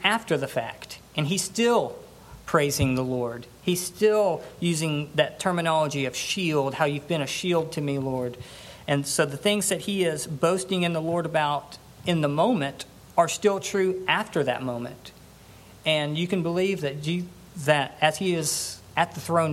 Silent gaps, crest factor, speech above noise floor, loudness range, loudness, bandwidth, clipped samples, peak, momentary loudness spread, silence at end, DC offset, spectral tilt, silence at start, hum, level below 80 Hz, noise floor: none; 22 dB; 24 dB; 2 LU; -25 LUFS; 16 kHz; under 0.1%; -4 dBFS; 9 LU; 0 s; under 0.1%; -4.5 dB/octave; 0 s; none; -56 dBFS; -49 dBFS